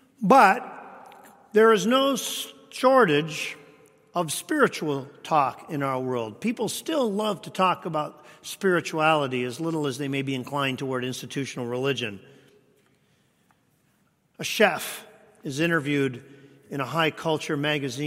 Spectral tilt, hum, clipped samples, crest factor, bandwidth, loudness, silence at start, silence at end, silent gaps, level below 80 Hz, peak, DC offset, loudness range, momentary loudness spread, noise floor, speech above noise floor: -4.5 dB/octave; none; under 0.1%; 22 dB; 16 kHz; -24 LUFS; 0.2 s; 0 s; none; -72 dBFS; -2 dBFS; under 0.1%; 7 LU; 15 LU; -67 dBFS; 42 dB